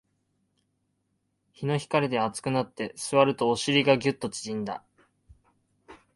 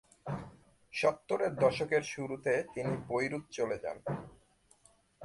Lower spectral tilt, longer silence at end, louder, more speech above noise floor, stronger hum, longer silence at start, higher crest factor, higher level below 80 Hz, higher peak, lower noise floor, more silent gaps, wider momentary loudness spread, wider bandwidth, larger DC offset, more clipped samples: about the same, -5 dB/octave vs -5.5 dB/octave; first, 0.2 s vs 0 s; first, -26 LUFS vs -34 LUFS; first, 50 dB vs 33 dB; neither; first, 1.6 s vs 0.25 s; about the same, 22 dB vs 20 dB; about the same, -64 dBFS vs -66 dBFS; first, -6 dBFS vs -14 dBFS; first, -76 dBFS vs -67 dBFS; neither; about the same, 12 LU vs 13 LU; about the same, 11.5 kHz vs 11.5 kHz; neither; neither